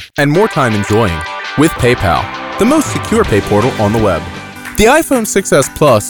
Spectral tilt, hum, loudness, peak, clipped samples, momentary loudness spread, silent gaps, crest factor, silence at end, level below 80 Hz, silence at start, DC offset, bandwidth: -5 dB/octave; none; -12 LUFS; 0 dBFS; under 0.1%; 9 LU; none; 12 dB; 0 s; -32 dBFS; 0 s; under 0.1%; over 20 kHz